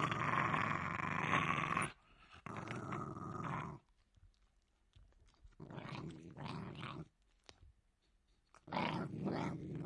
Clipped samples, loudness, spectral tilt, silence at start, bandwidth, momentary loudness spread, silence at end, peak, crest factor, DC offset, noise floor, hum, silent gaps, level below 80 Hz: under 0.1%; -41 LUFS; -5.5 dB/octave; 0 s; 11.5 kHz; 18 LU; 0 s; -18 dBFS; 26 dB; under 0.1%; -77 dBFS; none; none; -68 dBFS